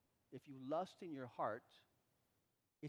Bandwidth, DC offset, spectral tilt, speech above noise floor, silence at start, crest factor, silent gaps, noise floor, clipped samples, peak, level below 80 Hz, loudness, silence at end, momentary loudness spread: 17.5 kHz; under 0.1%; -7 dB/octave; 38 dB; 0.3 s; 22 dB; none; -85 dBFS; under 0.1%; -30 dBFS; under -90 dBFS; -48 LUFS; 0 s; 14 LU